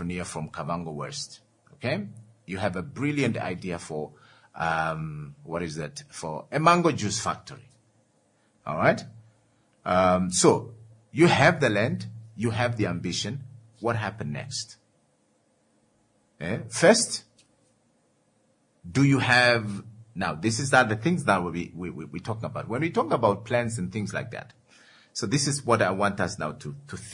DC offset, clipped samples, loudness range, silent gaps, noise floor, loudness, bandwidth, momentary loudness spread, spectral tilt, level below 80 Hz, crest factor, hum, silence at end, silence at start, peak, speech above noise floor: under 0.1%; under 0.1%; 8 LU; none; -67 dBFS; -26 LUFS; 11 kHz; 17 LU; -4.5 dB/octave; -62 dBFS; 22 dB; none; 0 s; 0 s; -4 dBFS; 42 dB